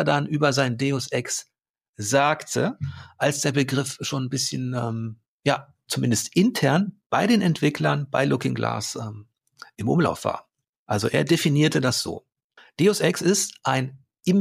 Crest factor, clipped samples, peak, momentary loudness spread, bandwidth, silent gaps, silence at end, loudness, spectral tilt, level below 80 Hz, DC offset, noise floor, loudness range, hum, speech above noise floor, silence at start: 16 dB; under 0.1%; -8 dBFS; 11 LU; 15.5 kHz; 1.70-1.74 s, 1.88-1.93 s, 5.28-5.40 s, 7.06-7.10 s, 10.69-10.86 s, 12.44-12.50 s; 0 s; -23 LUFS; -4.5 dB/octave; -62 dBFS; under 0.1%; -56 dBFS; 3 LU; none; 33 dB; 0 s